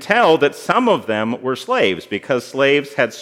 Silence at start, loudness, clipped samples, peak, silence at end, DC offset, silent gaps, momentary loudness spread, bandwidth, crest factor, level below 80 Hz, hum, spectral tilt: 0 s; -17 LUFS; under 0.1%; 0 dBFS; 0 s; under 0.1%; none; 8 LU; 16 kHz; 16 dB; -70 dBFS; none; -4.5 dB/octave